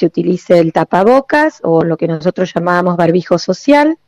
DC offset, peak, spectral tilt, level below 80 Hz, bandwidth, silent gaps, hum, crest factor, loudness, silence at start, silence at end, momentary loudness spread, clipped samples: under 0.1%; 0 dBFS; -7 dB/octave; -52 dBFS; 11 kHz; none; none; 12 dB; -12 LUFS; 0 s; 0.15 s; 6 LU; under 0.1%